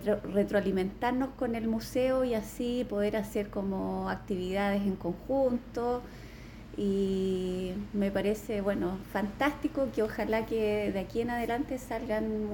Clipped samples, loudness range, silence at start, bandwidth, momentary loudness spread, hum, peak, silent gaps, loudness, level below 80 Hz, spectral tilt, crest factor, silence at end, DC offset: under 0.1%; 2 LU; 0 s; 19 kHz; 6 LU; none; -14 dBFS; none; -32 LUFS; -50 dBFS; -6.5 dB/octave; 16 dB; 0 s; under 0.1%